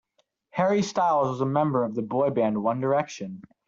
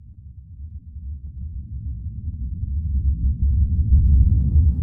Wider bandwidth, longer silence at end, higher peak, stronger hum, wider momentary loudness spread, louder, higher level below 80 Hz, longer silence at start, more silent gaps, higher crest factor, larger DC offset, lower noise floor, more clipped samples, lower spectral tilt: first, 7.8 kHz vs 0.6 kHz; first, 0.25 s vs 0 s; second, -10 dBFS vs -4 dBFS; neither; second, 11 LU vs 20 LU; second, -25 LUFS vs -21 LUFS; second, -68 dBFS vs -22 dBFS; first, 0.55 s vs 0 s; neither; about the same, 16 dB vs 16 dB; neither; first, -70 dBFS vs -41 dBFS; neither; second, -6.5 dB/octave vs -14 dB/octave